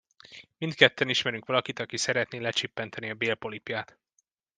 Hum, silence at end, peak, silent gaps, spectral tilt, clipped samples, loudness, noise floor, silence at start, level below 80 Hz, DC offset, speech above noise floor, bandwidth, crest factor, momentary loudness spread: none; 0.75 s; -2 dBFS; none; -3 dB/octave; under 0.1%; -28 LUFS; -75 dBFS; 0.3 s; -72 dBFS; under 0.1%; 46 dB; 10.5 kHz; 28 dB; 14 LU